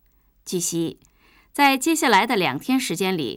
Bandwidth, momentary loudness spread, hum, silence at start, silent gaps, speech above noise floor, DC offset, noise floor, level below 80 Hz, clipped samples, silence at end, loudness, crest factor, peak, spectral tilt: over 20 kHz; 13 LU; none; 0.45 s; none; 24 dB; under 0.1%; -45 dBFS; -60 dBFS; under 0.1%; 0 s; -21 LUFS; 16 dB; -6 dBFS; -3 dB/octave